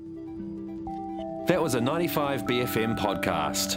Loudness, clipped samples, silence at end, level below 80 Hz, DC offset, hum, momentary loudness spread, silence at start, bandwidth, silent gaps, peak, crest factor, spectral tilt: -28 LUFS; under 0.1%; 0 s; -52 dBFS; under 0.1%; none; 11 LU; 0 s; 16.5 kHz; none; -6 dBFS; 22 dB; -4.5 dB/octave